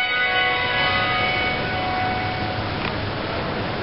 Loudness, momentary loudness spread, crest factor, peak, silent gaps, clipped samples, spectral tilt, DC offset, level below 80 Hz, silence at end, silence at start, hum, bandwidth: -21 LUFS; 7 LU; 14 dB; -10 dBFS; none; under 0.1%; -9 dB/octave; 0.4%; -40 dBFS; 0 s; 0 s; none; 5.8 kHz